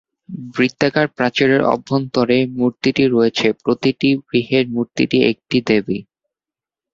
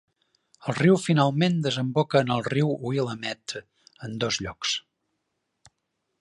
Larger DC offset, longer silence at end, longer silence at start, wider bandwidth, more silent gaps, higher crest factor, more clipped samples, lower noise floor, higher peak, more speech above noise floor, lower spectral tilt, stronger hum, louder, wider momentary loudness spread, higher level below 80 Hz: neither; second, 0.9 s vs 1.4 s; second, 0.3 s vs 0.65 s; second, 7.4 kHz vs 11 kHz; neither; about the same, 16 dB vs 20 dB; neither; first, -89 dBFS vs -79 dBFS; first, -2 dBFS vs -6 dBFS; first, 73 dB vs 54 dB; about the same, -6 dB/octave vs -5.5 dB/octave; neither; first, -17 LUFS vs -25 LUFS; second, 5 LU vs 14 LU; first, -54 dBFS vs -60 dBFS